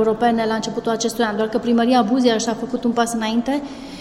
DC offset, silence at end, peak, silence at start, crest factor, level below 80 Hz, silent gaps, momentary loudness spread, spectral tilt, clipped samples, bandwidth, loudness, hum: under 0.1%; 0 s; -4 dBFS; 0 s; 16 dB; -50 dBFS; none; 7 LU; -4 dB/octave; under 0.1%; 15.5 kHz; -19 LUFS; none